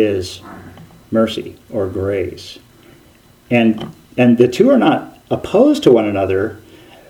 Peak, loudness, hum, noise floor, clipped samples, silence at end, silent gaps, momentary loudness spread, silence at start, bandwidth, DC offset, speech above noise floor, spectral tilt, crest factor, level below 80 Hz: 0 dBFS; -15 LUFS; none; -47 dBFS; under 0.1%; 0.5 s; none; 16 LU; 0 s; 16 kHz; under 0.1%; 33 dB; -6.5 dB/octave; 16 dB; -50 dBFS